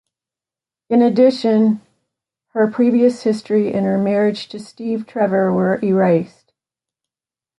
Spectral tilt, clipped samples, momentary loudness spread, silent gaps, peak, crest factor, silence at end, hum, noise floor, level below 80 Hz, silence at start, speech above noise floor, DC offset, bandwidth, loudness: -7.5 dB/octave; under 0.1%; 12 LU; none; -2 dBFS; 16 dB; 1.35 s; none; under -90 dBFS; -64 dBFS; 0.9 s; over 74 dB; under 0.1%; 11.5 kHz; -17 LUFS